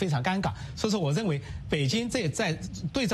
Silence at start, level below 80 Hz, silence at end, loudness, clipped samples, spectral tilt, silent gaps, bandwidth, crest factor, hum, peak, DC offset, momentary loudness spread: 0 s; -48 dBFS; 0 s; -29 LUFS; under 0.1%; -5 dB/octave; none; 13.5 kHz; 16 dB; none; -14 dBFS; under 0.1%; 6 LU